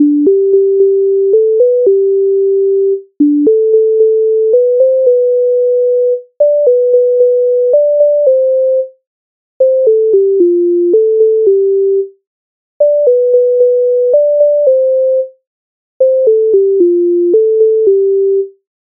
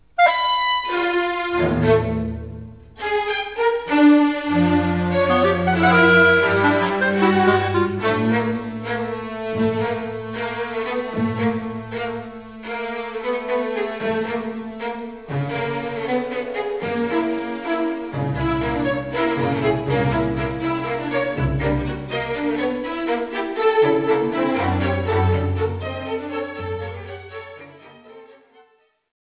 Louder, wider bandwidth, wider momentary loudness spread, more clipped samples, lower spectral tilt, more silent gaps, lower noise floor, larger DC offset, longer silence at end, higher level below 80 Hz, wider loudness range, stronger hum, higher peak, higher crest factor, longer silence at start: first, -10 LUFS vs -21 LUFS; second, 0.9 kHz vs 4 kHz; second, 4 LU vs 12 LU; neither; first, -13.5 dB/octave vs -10 dB/octave; first, 9.07-9.60 s, 12.27-12.80 s, 15.47-16.00 s vs none; first, under -90 dBFS vs -58 dBFS; second, under 0.1% vs 0.2%; second, 0.4 s vs 0.9 s; second, -70 dBFS vs -40 dBFS; second, 1 LU vs 9 LU; neither; about the same, 0 dBFS vs -2 dBFS; second, 8 dB vs 18 dB; second, 0 s vs 0.2 s